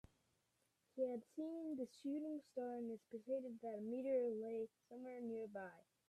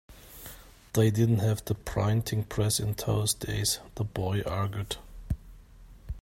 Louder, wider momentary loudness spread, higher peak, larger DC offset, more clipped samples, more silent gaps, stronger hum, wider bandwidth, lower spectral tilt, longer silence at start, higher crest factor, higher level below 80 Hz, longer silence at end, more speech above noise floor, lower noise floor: second, -47 LUFS vs -29 LUFS; second, 11 LU vs 17 LU; second, -32 dBFS vs -12 dBFS; neither; neither; neither; neither; second, 12.5 kHz vs 16.5 kHz; first, -7 dB/octave vs -5 dB/octave; first, 0.95 s vs 0.1 s; about the same, 16 dB vs 18 dB; second, -86 dBFS vs -46 dBFS; first, 0.3 s vs 0 s; first, 38 dB vs 23 dB; first, -85 dBFS vs -51 dBFS